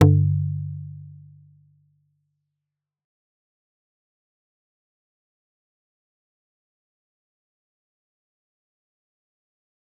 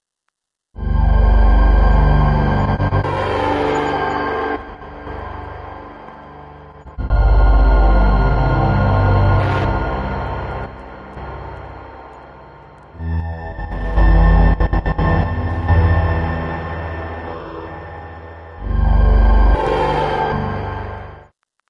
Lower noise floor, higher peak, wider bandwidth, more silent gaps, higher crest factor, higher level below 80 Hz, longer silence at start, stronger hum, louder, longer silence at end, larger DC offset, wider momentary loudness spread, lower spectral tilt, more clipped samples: first, -86 dBFS vs -75 dBFS; about the same, -2 dBFS vs -2 dBFS; second, 4 kHz vs 5.4 kHz; neither; first, 28 dB vs 14 dB; second, -62 dBFS vs -18 dBFS; second, 0 s vs 0.75 s; second, none vs 50 Hz at -30 dBFS; second, -23 LUFS vs -17 LUFS; first, 8.85 s vs 0.5 s; neither; first, 24 LU vs 20 LU; about the same, -9.5 dB/octave vs -8.5 dB/octave; neither